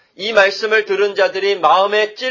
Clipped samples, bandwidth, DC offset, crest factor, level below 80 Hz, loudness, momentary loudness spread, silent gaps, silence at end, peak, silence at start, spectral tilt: under 0.1%; 7.4 kHz; under 0.1%; 16 dB; -66 dBFS; -15 LUFS; 4 LU; none; 0 s; 0 dBFS; 0.2 s; -2.5 dB/octave